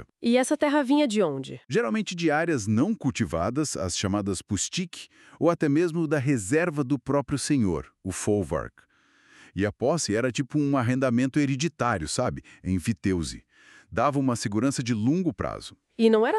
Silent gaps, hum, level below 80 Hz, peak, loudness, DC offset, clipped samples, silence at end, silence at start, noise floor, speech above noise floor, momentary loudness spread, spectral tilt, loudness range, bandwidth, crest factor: none; none; -52 dBFS; -8 dBFS; -26 LUFS; under 0.1%; under 0.1%; 0 s; 0 s; -59 dBFS; 34 dB; 9 LU; -5.5 dB/octave; 3 LU; 12.5 kHz; 16 dB